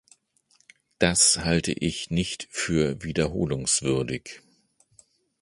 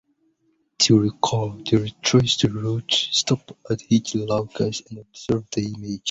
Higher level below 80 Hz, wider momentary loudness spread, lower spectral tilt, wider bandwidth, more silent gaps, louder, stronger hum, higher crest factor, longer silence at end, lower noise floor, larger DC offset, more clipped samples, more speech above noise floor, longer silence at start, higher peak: first, -46 dBFS vs -52 dBFS; about the same, 11 LU vs 12 LU; about the same, -3.5 dB/octave vs -4.5 dB/octave; first, 11.5 kHz vs 8.2 kHz; neither; about the same, -24 LUFS vs -22 LUFS; neither; about the same, 24 dB vs 20 dB; first, 1.05 s vs 0 s; about the same, -65 dBFS vs -67 dBFS; neither; neither; second, 40 dB vs 45 dB; first, 1 s vs 0.8 s; about the same, -4 dBFS vs -2 dBFS